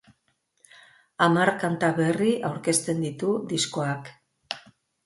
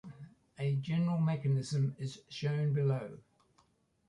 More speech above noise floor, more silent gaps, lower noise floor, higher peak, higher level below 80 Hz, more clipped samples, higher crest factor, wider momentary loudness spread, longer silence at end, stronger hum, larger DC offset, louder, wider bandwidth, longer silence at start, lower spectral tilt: first, 47 dB vs 39 dB; neither; about the same, -72 dBFS vs -72 dBFS; first, -6 dBFS vs -22 dBFS; about the same, -68 dBFS vs -70 dBFS; neither; first, 20 dB vs 14 dB; about the same, 15 LU vs 17 LU; second, 0.45 s vs 0.9 s; neither; neither; first, -25 LUFS vs -34 LUFS; first, 12 kHz vs 10.5 kHz; first, 1.2 s vs 0.05 s; second, -4.5 dB/octave vs -7.5 dB/octave